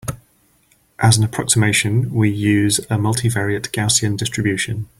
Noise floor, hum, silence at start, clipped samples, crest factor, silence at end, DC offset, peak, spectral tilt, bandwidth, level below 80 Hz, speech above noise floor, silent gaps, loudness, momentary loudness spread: -58 dBFS; none; 0.05 s; under 0.1%; 18 dB; 0.15 s; under 0.1%; 0 dBFS; -4 dB/octave; 15.5 kHz; -46 dBFS; 41 dB; none; -17 LUFS; 6 LU